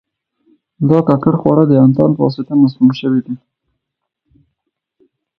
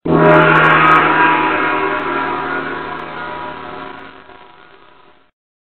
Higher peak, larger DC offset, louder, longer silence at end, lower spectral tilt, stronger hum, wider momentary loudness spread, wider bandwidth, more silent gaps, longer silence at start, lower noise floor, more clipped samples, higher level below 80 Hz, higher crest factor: about the same, 0 dBFS vs 0 dBFS; second, under 0.1% vs 0.9%; about the same, -12 LUFS vs -12 LUFS; first, 2.05 s vs 1.3 s; first, -10.5 dB/octave vs -7.5 dB/octave; neither; second, 9 LU vs 20 LU; second, 5.6 kHz vs 6.8 kHz; neither; first, 0.8 s vs 0.05 s; first, -76 dBFS vs -47 dBFS; neither; second, -52 dBFS vs -46 dBFS; about the same, 14 dB vs 16 dB